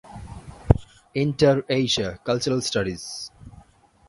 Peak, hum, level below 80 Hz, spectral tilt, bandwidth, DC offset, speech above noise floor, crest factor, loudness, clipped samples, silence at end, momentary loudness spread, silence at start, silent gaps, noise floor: 0 dBFS; none; -38 dBFS; -5 dB/octave; 11.5 kHz; under 0.1%; 30 dB; 24 dB; -23 LUFS; under 0.1%; 0.5 s; 20 LU; 0.05 s; none; -53 dBFS